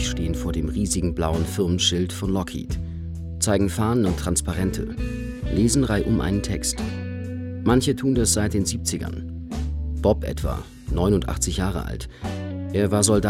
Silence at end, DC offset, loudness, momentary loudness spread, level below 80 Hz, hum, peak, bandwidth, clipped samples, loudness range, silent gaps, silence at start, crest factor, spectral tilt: 0 s; under 0.1%; -24 LUFS; 11 LU; -32 dBFS; none; -4 dBFS; 16.5 kHz; under 0.1%; 3 LU; none; 0 s; 20 dB; -5 dB/octave